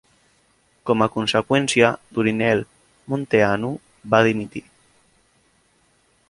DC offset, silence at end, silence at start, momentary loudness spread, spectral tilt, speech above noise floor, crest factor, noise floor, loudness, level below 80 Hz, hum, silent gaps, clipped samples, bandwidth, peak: under 0.1%; 1.7 s; 0.85 s; 16 LU; -5 dB/octave; 42 dB; 20 dB; -62 dBFS; -20 LUFS; -56 dBFS; none; none; under 0.1%; 11.5 kHz; -2 dBFS